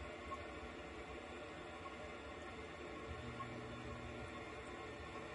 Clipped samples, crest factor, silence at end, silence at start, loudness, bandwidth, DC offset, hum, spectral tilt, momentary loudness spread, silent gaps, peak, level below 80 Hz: under 0.1%; 14 dB; 0 s; 0 s; -50 LUFS; 11 kHz; under 0.1%; none; -5 dB/octave; 2 LU; none; -36 dBFS; -62 dBFS